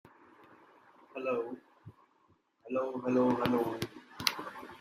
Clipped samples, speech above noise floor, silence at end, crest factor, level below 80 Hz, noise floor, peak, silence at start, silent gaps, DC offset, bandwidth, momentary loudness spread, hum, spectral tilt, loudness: under 0.1%; 39 dB; 0.05 s; 28 dB; -70 dBFS; -70 dBFS; -8 dBFS; 0.5 s; none; under 0.1%; 15.5 kHz; 15 LU; none; -4.5 dB/octave; -33 LUFS